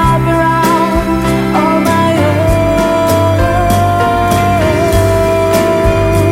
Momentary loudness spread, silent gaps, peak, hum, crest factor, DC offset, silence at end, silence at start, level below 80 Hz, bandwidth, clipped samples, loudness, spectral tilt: 1 LU; none; 0 dBFS; none; 10 dB; under 0.1%; 0 s; 0 s; -22 dBFS; 16.5 kHz; under 0.1%; -11 LUFS; -6 dB/octave